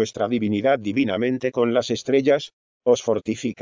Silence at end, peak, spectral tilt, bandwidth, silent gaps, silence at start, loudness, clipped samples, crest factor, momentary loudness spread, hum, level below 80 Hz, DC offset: 0 s; -6 dBFS; -5.5 dB/octave; 7.6 kHz; 2.53-2.80 s; 0 s; -22 LUFS; under 0.1%; 16 dB; 5 LU; none; -58 dBFS; under 0.1%